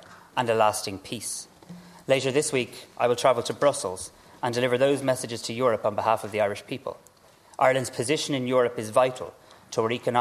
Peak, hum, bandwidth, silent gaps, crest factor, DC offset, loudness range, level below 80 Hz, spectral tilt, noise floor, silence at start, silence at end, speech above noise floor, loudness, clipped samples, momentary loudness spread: -6 dBFS; none; 14 kHz; none; 20 dB; under 0.1%; 1 LU; -66 dBFS; -4 dB/octave; -55 dBFS; 0.1 s; 0 s; 30 dB; -26 LUFS; under 0.1%; 13 LU